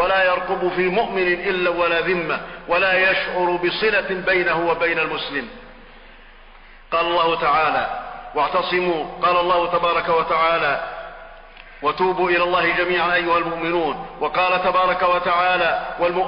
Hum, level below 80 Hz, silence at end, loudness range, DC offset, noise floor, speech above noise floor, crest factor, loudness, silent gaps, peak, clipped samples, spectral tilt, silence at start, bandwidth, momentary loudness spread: none; -46 dBFS; 0 s; 3 LU; under 0.1%; -44 dBFS; 24 dB; 12 dB; -19 LUFS; none; -8 dBFS; under 0.1%; -8 dB/octave; 0 s; 5.4 kHz; 8 LU